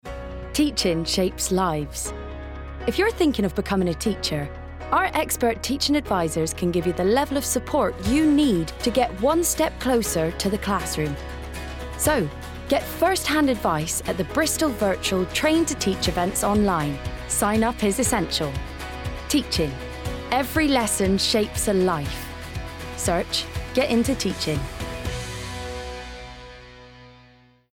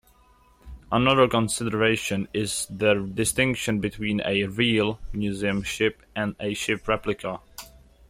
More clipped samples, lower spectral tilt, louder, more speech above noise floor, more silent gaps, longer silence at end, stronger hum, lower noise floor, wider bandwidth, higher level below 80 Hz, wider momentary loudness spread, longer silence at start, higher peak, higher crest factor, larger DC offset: neither; about the same, -4 dB/octave vs -4 dB/octave; about the same, -23 LUFS vs -24 LUFS; about the same, 32 dB vs 33 dB; neither; first, 0.6 s vs 0.4 s; neither; second, -54 dBFS vs -58 dBFS; first, 18 kHz vs 16 kHz; first, -38 dBFS vs -48 dBFS; first, 13 LU vs 9 LU; second, 0.05 s vs 0.65 s; about the same, -8 dBFS vs -6 dBFS; about the same, 14 dB vs 18 dB; neither